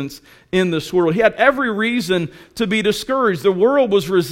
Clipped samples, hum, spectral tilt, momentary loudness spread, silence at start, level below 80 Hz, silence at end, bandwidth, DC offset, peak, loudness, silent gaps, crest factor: under 0.1%; none; -5.5 dB/octave; 7 LU; 0 s; -50 dBFS; 0 s; 16.5 kHz; under 0.1%; 0 dBFS; -17 LUFS; none; 18 dB